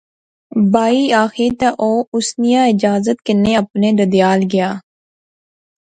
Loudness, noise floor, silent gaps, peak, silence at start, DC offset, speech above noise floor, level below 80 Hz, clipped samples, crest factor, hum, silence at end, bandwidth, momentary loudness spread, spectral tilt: -15 LUFS; under -90 dBFS; 2.07-2.12 s; 0 dBFS; 0.55 s; under 0.1%; over 76 dB; -50 dBFS; under 0.1%; 14 dB; none; 1.05 s; 9.2 kHz; 5 LU; -5.5 dB/octave